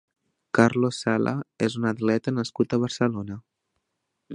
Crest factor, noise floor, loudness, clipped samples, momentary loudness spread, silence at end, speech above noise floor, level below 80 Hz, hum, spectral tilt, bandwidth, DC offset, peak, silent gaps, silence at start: 24 dB; -79 dBFS; -25 LUFS; under 0.1%; 7 LU; 0 s; 55 dB; -62 dBFS; none; -6 dB/octave; 10.5 kHz; under 0.1%; -2 dBFS; none; 0.55 s